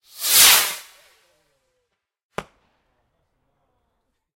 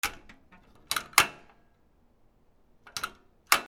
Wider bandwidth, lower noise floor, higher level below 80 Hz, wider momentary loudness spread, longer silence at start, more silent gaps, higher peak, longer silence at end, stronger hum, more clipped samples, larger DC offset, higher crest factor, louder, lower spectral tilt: second, 16.5 kHz vs over 20 kHz; first, -76 dBFS vs -64 dBFS; about the same, -60 dBFS vs -60 dBFS; first, 25 LU vs 16 LU; first, 0.2 s vs 0.05 s; first, 2.24-2.30 s vs none; about the same, 0 dBFS vs 0 dBFS; first, 1.95 s vs 0 s; neither; neither; neither; second, 24 dB vs 32 dB; first, -13 LUFS vs -28 LUFS; second, 2 dB/octave vs 0.5 dB/octave